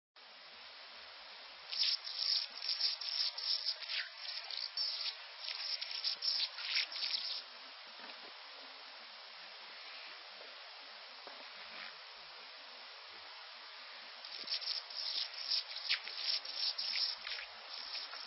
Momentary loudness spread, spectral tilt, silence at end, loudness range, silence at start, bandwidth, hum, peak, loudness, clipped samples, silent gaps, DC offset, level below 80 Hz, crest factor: 16 LU; 0.5 dB/octave; 0 s; 13 LU; 0.15 s; 6 kHz; none; -22 dBFS; -38 LUFS; under 0.1%; none; under 0.1%; under -90 dBFS; 20 dB